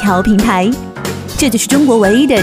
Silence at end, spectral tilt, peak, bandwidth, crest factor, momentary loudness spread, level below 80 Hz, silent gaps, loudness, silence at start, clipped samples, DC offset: 0 s; -4.5 dB/octave; 0 dBFS; 16 kHz; 12 dB; 11 LU; -32 dBFS; none; -12 LUFS; 0 s; under 0.1%; under 0.1%